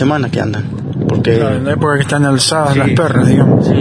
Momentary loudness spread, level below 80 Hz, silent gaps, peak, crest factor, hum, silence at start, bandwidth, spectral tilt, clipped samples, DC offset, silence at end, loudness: 8 LU; -40 dBFS; none; 0 dBFS; 12 dB; none; 0 s; 10.5 kHz; -6 dB/octave; under 0.1%; under 0.1%; 0 s; -12 LUFS